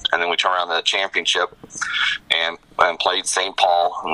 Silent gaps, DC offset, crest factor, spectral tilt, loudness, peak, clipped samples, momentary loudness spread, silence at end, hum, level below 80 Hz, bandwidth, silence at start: none; under 0.1%; 20 dB; 0.5 dB/octave; -19 LUFS; 0 dBFS; under 0.1%; 5 LU; 0 s; none; -58 dBFS; 12 kHz; 0 s